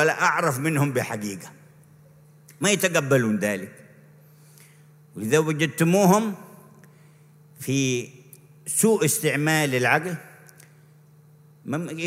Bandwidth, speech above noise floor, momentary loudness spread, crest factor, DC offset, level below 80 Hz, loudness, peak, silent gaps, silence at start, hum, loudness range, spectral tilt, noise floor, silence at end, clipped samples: 16 kHz; 30 dB; 18 LU; 20 dB; under 0.1%; -70 dBFS; -22 LUFS; -4 dBFS; none; 0 s; none; 3 LU; -4.5 dB/octave; -53 dBFS; 0 s; under 0.1%